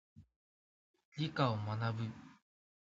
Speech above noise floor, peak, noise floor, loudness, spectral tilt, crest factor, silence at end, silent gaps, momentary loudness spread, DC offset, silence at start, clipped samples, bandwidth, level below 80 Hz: over 53 dB; -18 dBFS; under -90 dBFS; -38 LUFS; -5.5 dB/octave; 24 dB; 0.55 s; 0.36-0.94 s, 1.05-1.12 s; 16 LU; under 0.1%; 0.15 s; under 0.1%; 7.6 kHz; -72 dBFS